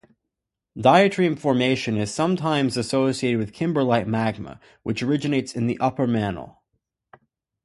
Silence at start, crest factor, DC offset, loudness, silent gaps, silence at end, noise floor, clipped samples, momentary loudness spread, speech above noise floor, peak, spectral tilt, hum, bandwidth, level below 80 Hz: 0.75 s; 22 dB; under 0.1%; -22 LUFS; none; 1.15 s; -83 dBFS; under 0.1%; 12 LU; 62 dB; -2 dBFS; -6 dB/octave; none; 11.5 kHz; -56 dBFS